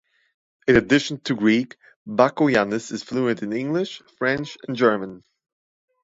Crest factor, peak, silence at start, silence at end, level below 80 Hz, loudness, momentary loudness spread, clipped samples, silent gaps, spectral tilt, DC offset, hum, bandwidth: 20 dB; -2 dBFS; 0.65 s; 0.85 s; -54 dBFS; -22 LUFS; 11 LU; under 0.1%; 1.96-2.06 s; -5.5 dB/octave; under 0.1%; none; 8 kHz